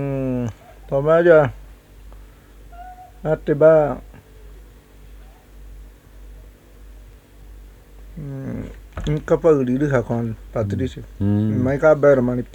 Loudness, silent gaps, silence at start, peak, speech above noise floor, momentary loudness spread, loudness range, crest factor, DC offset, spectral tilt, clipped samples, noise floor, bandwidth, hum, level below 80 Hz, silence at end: -19 LUFS; none; 0 s; 0 dBFS; 27 dB; 19 LU; 18 LU; 20 dB; under 0.1%; -8.5 dB/octave; under 0.1%; -44 dBFS; 18 kHz; none; -40 dBFS; 0.1 s